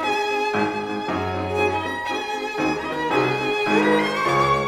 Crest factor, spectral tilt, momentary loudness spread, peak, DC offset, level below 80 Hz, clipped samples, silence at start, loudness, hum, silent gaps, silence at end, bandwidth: 16 dB; -5 dB/octave; 7 LU; -6 dBFS; under 0.1%; -52 dBFS; under 0.1%; 0 s; -22 LUFS; none; none; 0 s; 17 kHz